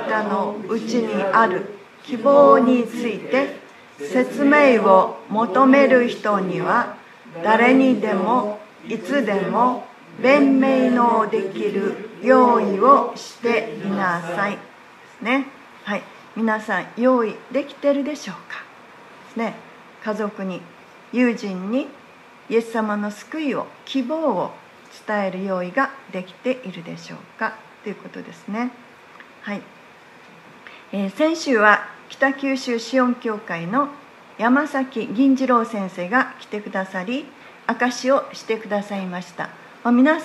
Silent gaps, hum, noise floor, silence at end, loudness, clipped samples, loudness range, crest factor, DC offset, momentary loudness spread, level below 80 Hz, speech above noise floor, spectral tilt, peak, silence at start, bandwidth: none; none; -46 dBFS; 0 s; -20 LUFS; under 0.1%; 10 LU; 20 dB; under 0.1%; 18 LU; -76 dBFS; 27 dB; -6 dB/octave; 0 dBFS; 0 s; 12 kHz